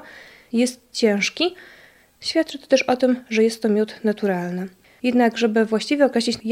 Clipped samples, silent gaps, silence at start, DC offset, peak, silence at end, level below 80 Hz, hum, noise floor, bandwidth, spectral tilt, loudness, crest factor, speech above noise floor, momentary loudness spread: under 0.1%; none; 0.05 s; under 0.1%; -4 dBFS; 0 s; -66 dBFS; none; -44 dBFS; 15.5 kHz; -4.5 dB/octave; -21 LUFS; 18 dB; 24 dB; 7 LU